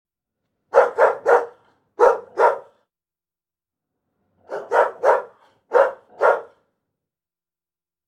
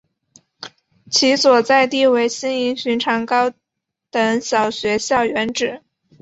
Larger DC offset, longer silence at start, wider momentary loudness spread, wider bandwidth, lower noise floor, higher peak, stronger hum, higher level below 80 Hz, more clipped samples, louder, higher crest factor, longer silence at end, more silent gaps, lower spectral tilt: neither; first, 0.75 s vs 0.6 s; second, 8 LU vs 12 LU; first, 11 kHz vs 8 kHz; first, under -90 dBFS vs -81 dBFS; about the same, 0 dBFS vs -2 dBFS; neither; second, -70 dBFS vs -60 dBFS; neither; about the same, -19 LUFS vs -17 LUFS; about the same, 20 dB vs 16 dB; first, 1.65 s vs 0.45 s; neither; about the same, -3.5 dB/octave vs -2.5 dB/octave